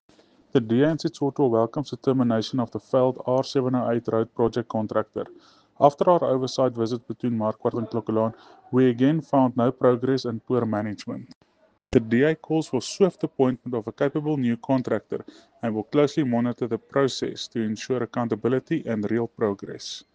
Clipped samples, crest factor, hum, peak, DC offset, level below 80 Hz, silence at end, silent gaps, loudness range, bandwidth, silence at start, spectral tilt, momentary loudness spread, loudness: under 0.1%; 20 dB; none; -4 dBFS; under 0.1%; -58 dBFS; 0.15 s; 11.36-11.41 s; 2 LU; 9.2 kHz; 0.55 s; -7 dB/octave; 8 LU; -24 LUFS